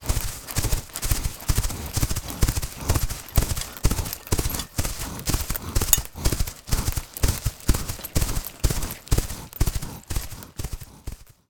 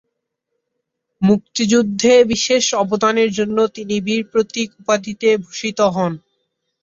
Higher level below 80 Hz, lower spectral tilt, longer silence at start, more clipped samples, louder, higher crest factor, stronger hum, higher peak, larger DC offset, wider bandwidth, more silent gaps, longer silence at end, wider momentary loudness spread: first, -28 dBFS vs -54 dBFS; about the same, -3.5 dB/octave vs -4 dB/octave; second, 0 s vs 1.2 s; neither; second, -27 LUFS vs -17 LUFS; first, 24 dB vs 16 dB; neither; about the same, 0 dBFS vs -2 dBFS; neither; first, 19 kHz vs 7.8 kHz; neither; second, 0.25 s vs 0.65 s; about the same, 7 LU vs 9 LU